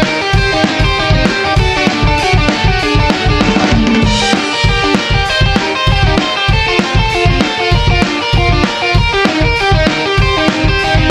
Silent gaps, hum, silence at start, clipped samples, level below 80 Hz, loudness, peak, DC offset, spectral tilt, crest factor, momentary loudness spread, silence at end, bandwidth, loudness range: none; none; 0 s; under 0.1%; -18 dBFS; -11 LUFS; 0 dBFS; under 0.1%; -5 dB/octave; 10 dB; 1 LU; 0 s; 11.5 kHz; 0 LU